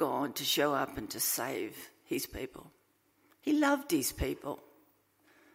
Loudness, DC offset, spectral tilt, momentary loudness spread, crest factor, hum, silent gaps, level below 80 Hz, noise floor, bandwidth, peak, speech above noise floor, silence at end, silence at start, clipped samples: -33 LUFS; under 0.1%; -3 dB/octave; 15 LU; 20 dB; none; none; -54 dBFS; -71 dBFS; 16 kHz; -16 dBFS; 38 dB; 0.95 s; 0 s; under 0.1%